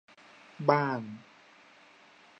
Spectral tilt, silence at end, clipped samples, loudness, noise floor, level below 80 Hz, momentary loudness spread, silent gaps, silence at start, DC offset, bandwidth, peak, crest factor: -7.5 dB/octave; 1.2 s; under 0.1%; -29 LUFS; -58 dBFS; -84 dBFS; 23 LU; none; 0.6 s; under 0.1%; 8.6 kHz; -8 dBFS; 26 dB